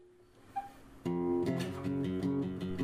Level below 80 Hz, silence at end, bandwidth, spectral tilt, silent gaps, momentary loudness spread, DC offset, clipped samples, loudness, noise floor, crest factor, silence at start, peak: -62 dBFS; 0 s; 15 kHz; -7.5 dB/octave; none; 11 LU; under 0.1%; under 0.1%; -36 LUFS; -60 dBFS; 14 dB; 0 s; -22 dBFS